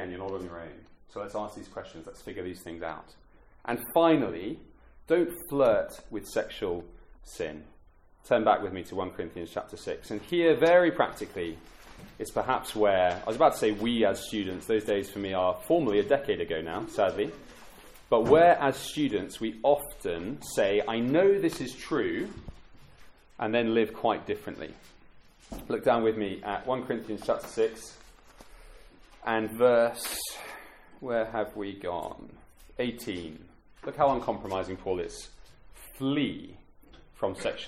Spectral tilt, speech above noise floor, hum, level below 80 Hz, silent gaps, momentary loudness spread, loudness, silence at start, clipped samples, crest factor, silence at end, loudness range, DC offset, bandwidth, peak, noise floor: -5 dB/octave; 29 dB; none; -56 dBFS; none; 19 LU; -28 LUFS; 0 s; under 0.1%; 22 dB; 0 s; 7 LU; under 0.1%; 16.5 kHz; -8 dBFS; -57 dBFS